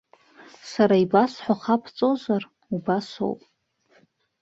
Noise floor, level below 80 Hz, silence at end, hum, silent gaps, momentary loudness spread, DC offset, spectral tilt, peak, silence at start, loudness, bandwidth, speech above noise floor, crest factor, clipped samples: -63 dBFS; -68 dBFS; 1.05 s; none; none; 13 LU; under 0.1%; -7 dB/octave; -6 dBFS; 0.65 s; -24 LUFS; 7.8 kHz; 41 dB; 20 dB; under 0.1%